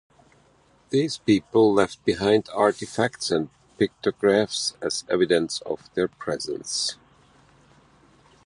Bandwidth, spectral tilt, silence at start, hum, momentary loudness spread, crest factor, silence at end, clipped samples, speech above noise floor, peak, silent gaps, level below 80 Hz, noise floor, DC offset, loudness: 11.5 kHz; -4 dB/octave; 0.9 s; none; 9 LU; 20 dB; 1.5 s; under 0.1%; 36 dB; -4 dBFS; none; -58 dBFS; -59 dBFS; under 0.1%; -24 LUFS